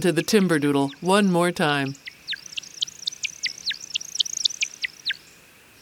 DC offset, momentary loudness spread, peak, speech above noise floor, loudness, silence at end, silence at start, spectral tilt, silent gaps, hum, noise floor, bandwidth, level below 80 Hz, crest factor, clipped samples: under 0.1%; 11 LU; -6 dBFS; 31 dB; -24 LUFS; 0.65 s; 0 s; -3.5 dB/octave; none; none; -51 dBFS; 18 kHz; -66 dBFS; 20 dB; under 0.1%